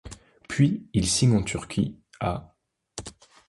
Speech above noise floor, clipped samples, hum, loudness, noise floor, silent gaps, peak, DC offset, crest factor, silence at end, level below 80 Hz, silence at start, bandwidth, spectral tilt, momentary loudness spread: 20 dB; under 0.1%; none; -25 LUFS; -44 dBFS; none; -8 dBFS; under 0.1%; 18 dB; 0.4 s; -46 dBFS; 0.05 s; 11.5 kHz; -5 dB/octave; 21 LU